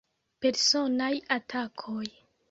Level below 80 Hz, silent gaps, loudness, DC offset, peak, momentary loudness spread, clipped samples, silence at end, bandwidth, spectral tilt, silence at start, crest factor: -72 dBFS; none; -28 LUFS; under 0.1%; -10 dBFS; 13 LU; under 0.1%; 0.4 s; 8 kHz; -2 dB/octave; 0.4 s; 20 dB